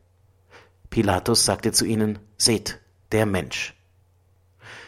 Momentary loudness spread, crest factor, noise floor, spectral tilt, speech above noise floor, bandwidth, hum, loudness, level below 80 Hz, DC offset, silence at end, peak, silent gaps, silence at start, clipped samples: 13 LU; 22 dB; -60 dBFS; -3.5 dB/octave; 38 dB; 16.5 kHz; none; -22 LUFS; -48 dBFS; under 0.1%; 0 s; -4 dBFS; none; 0.55 s; under 0.1%